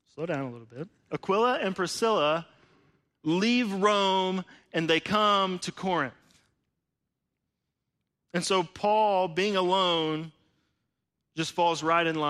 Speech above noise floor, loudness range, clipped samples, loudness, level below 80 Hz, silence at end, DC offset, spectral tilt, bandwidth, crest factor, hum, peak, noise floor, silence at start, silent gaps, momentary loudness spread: 57 dB; 5 LU; under 0.1%; -27 LUFS; -70 dBFS; 0 s; under 0.1%; -4.5 dB/octave; 13.5 kHz; 18 dB; none; -10 dBFS; -84 dBFS; 0.2 s; none; 12 LU